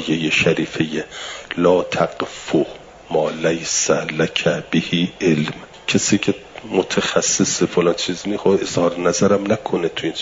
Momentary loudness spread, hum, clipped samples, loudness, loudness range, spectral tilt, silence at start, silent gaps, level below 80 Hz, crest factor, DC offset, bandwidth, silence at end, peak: 7 LU; none; under 0.1%; -19 LUFS; 2 LU; -4 dB/octave; 0 s; none; -54 dBFS; 16 dB; under 0.1%; 7.8 kHz; 0 s; -2 dBFS